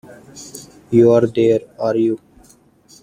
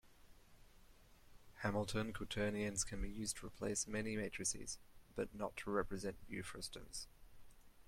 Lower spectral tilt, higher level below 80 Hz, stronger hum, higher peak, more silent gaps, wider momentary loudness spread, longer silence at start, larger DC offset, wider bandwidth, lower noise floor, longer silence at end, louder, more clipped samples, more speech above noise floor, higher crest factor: first, -7 dB/octave vs -3.5 dB/octave; about the same, -56 dBFS vs -58 dBFS; neither; first, -2 dBFS vs -24 dBFS; neither; first, 23 LU vs 9 LU; about the same, 0.1 s vs 0.05 s; neither; second, 14.5 kHz vs 16.5 kHz; second, -50 dBFS vs -64 dBFS; first, 0.85 s vs 0 s; first, -16 LUFS vs -44 LUFS; neither; first, 34 dB vs 21 dB; second, 16 dB vs 22 dB